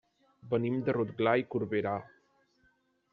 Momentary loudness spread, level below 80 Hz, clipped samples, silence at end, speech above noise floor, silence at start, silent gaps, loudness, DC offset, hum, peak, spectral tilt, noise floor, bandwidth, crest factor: 6 LU; -72 dBFS; under 0.1%; 1.1 s; 41 dB; 0.45 s; none; -32 LUFS; under 0.1%; none; -12 dBFS; -6 dB/octave; -71 dBFS; 5.6 kHz; 20 dB